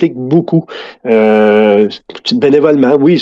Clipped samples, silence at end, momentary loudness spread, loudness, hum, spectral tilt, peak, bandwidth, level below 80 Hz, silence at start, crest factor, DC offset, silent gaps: 0.1%; 0 s; 9 LU; -10 LUFS; none; -7.5 dB/octave; 0 dBFS; 7.6 kHz; -56 dBFS; 0 s; 10 dB; under 0.1%; none